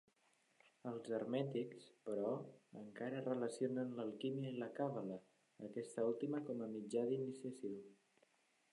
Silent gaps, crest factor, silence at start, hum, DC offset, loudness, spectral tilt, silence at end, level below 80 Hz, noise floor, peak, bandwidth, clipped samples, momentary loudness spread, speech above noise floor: none; 18 dB; 0.85 s; none; under 0.1%; -45 LUFS; -7 dB/octave; 0.8 s; under -90 dBFS; -78 dBFS; -28 dBFS; 11 kHz; under 0.1%; 13 LU; 34 dB